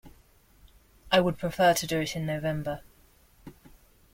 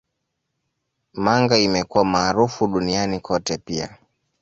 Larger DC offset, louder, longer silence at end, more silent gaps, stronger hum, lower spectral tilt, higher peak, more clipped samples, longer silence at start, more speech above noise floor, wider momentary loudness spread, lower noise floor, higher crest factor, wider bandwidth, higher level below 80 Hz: neither; second, -27 LUFS vs -20 LUFS; about the same, 0.6 s vs 0.5 s; neither; neither; about the same, -4.5 dB/octave vs -4.5 dB/octave; second, -8 dBFS vs -2 dBFS; neither; second, 0.05 s vs 1.15 s; second, 33 dB vs 57 dB; about the same, 11 LU vs 12 LU; second, -60 dBFS vs -77 dBFS; about the same, 22 dB vs 20 dB; first, 16.5 kHz vs 8 kHz; about the same, -54 dBFS vs -50 dBFS